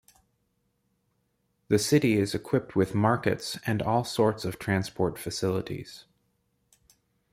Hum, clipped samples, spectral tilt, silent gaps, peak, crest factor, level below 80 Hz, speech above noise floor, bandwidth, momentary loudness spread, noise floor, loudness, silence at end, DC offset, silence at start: none; under 0.1%; -5.5 dB/octave; none; -10 dBFS; 20 dB; -60 dBFS; 48 dB; 16 kHz; 9 LU; -74 dBFS; -27 LUFS; 1.3 s; under 0.1%; 1.7 s